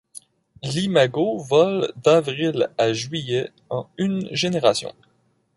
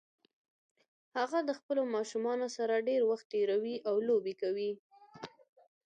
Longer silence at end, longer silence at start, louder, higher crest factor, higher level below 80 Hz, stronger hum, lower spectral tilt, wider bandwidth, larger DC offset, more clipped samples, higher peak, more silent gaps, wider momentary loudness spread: about the same, 0.65 s vs 0.6 s; second, 0.15 s vs 1.15 s; first, -21 LUFS vs -34 LUFS; about the same, 18 dB vs 16 dB; first, -62 dBFS vs -88 dBFS; neither; about the same, -5 dB/octave vs -4.5 dB/octave; first, 11.5 kHz vs 9.4 kHz; neither; neither; first, -4 dBFS vs -20 dBFS; second, none vs 1.63-1.69 s, 3.25-3.30 s, 4.79-4.90 s; second, 10 LU vs 15 LU